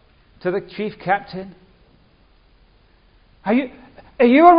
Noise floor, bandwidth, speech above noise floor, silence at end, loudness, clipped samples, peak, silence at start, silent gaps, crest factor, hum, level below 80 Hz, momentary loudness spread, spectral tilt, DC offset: -54 dBFS; 5.2 kHz; 38 dB; 0 s; -20 LUFS; under 0.1%; 0 dBFS; 0.45 s; none; 20 dB; none; -54 dBFS; 18 LU; -9.5 dB/octave; under 0.1%